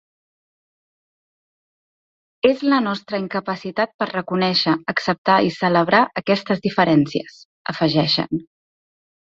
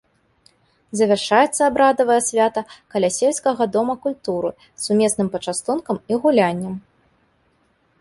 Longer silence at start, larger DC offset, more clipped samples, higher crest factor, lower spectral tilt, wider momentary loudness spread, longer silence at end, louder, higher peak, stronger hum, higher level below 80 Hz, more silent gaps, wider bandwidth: first, 2.45 s vs 0.95 s; neither; neither; about the same, 20 dB vs 18 dB; first, -6.5 dB/octave vs -4 dB/octave; second, 9 LU vs 12 LU; second, 0.95 s vs 1.2 s; about the same, -19 LUFS vs -19 LUFS; about the same, -2 dBFS vs -2 dBFS; neither; about the same, -60 dBFS vs -60 dBFS; first, 3.94-3.99 s, 5.18-5.25 s, 7.45-7.65 s vs none; second, 7.6 kHz vs 11.5 kHz